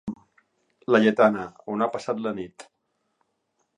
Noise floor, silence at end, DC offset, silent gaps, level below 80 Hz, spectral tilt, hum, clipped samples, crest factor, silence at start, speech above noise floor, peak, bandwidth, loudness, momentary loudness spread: -74 dBFS; 1.15 s; under 0.1%; none; -66 dBFS; -6.5 dB/octave; none; under 0.1%; 22 dB; 0.05 s; 51 dB; -4 dBFS; 9.8 kHz; -23 LUFS; 20 LU